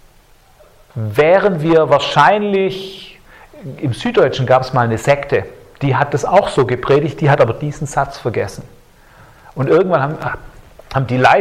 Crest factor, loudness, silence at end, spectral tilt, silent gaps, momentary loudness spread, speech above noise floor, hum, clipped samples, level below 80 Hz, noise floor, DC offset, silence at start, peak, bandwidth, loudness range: 16 dB; -15 LUFS; 0 s; -6.5 dB/octave; none; 15 LU; 34 dB; none; under 0.1%; -44 dBFS; -48 dBFS; under 0.1%; 0.95 s; 0 dBFS; 14.5 kHz; 3 LU